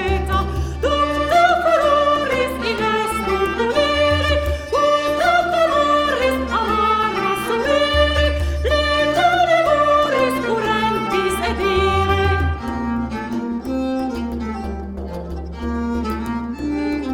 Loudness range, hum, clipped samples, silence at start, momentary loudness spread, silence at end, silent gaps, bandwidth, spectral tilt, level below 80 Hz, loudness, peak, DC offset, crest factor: 8 LU; none; under 0.1%; 0 s; 10 LU; 0 s; none; 17.5 kHz; -5.5 dB/octave; -30 dBFS; -18 LUFS; -2 dBFS; under 0.1%; 16 dB